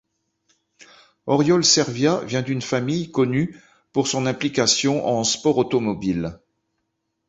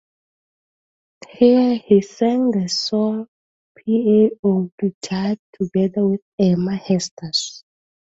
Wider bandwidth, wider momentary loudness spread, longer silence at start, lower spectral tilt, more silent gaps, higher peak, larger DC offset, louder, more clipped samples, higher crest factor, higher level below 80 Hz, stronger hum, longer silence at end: about the same, 8.2 kHz vs 8 kHz; about the same, 9 LU vs 10 LU; second, 1.25 s vs 1.4 s; second, -4 dB/octave vs -6 dB/octave; second, none vs 3.28-3.75 s, 4.39-4.43 s, 4.72-4.78 s, 4.94-5.01 s, 5.39-5.53 s, 6.22-6.38 s, 7.11-7.17 s; about the same, -4 dBFS vs -2 dBFS; neither; about the same, -20 LUFS vs -19 LUFS; neither; about the same, 20 dB vs 18 dB; first, -54 dBFS vs -60 dBFS; neither; first, 0.95 s vs 0.6 s